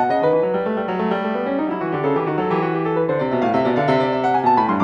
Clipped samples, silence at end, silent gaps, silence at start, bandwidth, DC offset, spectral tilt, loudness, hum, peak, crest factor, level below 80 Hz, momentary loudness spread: under 0.1%; 0 s; none; 0 s; 8.4 kHz; under 0.1%; -8 dB/octave; -19 LUFS; none; -6 dBFS; 14 dB; -56 dBFS; 5 LU